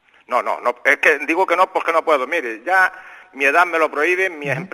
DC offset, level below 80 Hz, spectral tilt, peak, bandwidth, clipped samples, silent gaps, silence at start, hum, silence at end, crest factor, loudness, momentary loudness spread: under 0.1%; -70 dBFS; -4 dB/octave; 0 dBFS; 14 kHz; under 0.1%; none; 0.3 s; none; 0.05 s; 18 dB; -17 LUFS; 7 LU